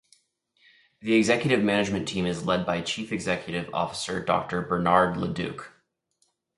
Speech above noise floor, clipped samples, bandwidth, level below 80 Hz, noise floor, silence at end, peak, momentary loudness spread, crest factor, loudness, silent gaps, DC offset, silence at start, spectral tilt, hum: 47 dB; under 0.1%; 11.5 kHz; -56 dBFS; -72 dBFS; 0.9 s; -4 dBFS; 9 LU; 22 dB; -26 LUFS; none; under 0.1%; 1 s; -5 dB/octave; none